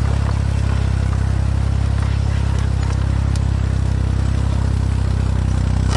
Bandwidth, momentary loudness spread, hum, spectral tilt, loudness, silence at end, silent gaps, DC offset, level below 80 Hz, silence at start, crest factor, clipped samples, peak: 11 kHz; 0 LU; none; -7 dB/octave; -19 LUFS; 0 s; none; under 0.1%; -20 dBFS; 0 s; 12 dB; under 0.1%; -4 dBFS